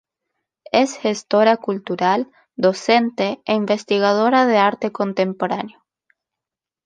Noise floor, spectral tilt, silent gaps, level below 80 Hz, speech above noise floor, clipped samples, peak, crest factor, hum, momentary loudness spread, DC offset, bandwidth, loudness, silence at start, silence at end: -87 dBFS; -5 dB/octave; none; -70 dBFS; 69 dB; under 0.1%; -2 dBFS; 18 dB; none; 8 LU; under 0.1%; 9.8 kHz; -18 LUFS; 0.75 s; 1.2 s